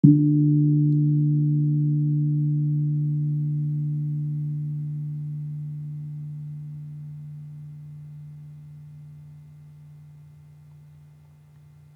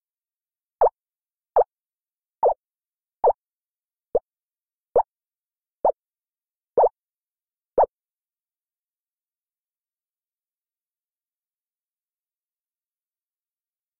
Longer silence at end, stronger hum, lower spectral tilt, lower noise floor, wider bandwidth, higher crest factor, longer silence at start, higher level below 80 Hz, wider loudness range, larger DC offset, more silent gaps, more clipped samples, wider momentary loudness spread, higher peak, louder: second, 1.7 s vs 6.15 s; neither; first, -13.5 dB/octave vs -0.5 dB/octave; second, -51 dBFS vs under -90 dBFS; second, 0.9 kHz vs 2.2 kHz; about the same, 24 dB vs 20 dB; second, 0.05 s vs 0.8 s; second, -70 dBFS vs -58 dBFS; first, 23 LU vs 6 LU; neither; neither; neither; first, 23 LU vs 7 LU; first, -2 dBFS vs -10 dBFS; about the same, -24 LUFS vs -24 LUFS